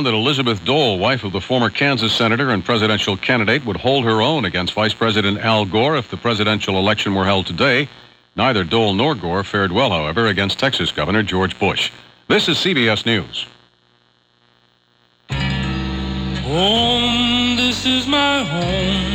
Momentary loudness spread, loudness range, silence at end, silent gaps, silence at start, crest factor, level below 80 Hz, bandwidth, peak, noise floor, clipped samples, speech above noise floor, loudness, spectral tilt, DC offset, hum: 6 LU; 4 LU; 0 s; none; 0 s; 16 dB; -38 dBFS; 16.5 kHz; -2 dBFS; -58 dBFS; under 0.1%; 41 dB; -17 LUFS; -5 dB/octave; under 0.1%; 60 Hz at -45 dBFS